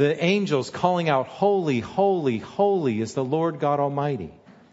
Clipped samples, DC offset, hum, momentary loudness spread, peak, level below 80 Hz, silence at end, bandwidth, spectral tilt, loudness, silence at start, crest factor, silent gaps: under 0.1%; under 0.1%; none; 5 LU; -6 dBFS; -62 dBFS; 0.4 s; 8 kHz; -6.5 dB/octave; -23 LUFS; 0 s; 18 dB; none